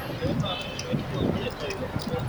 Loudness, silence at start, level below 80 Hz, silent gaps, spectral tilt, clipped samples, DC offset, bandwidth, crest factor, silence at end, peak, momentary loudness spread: -29 LUFS; 0 s; -44 dBFS; none; -6 dB/octave; under 0.1%; under 0.1%; over 20 kHz; 18 dB; 0 s; -10 dBFS; 4 LU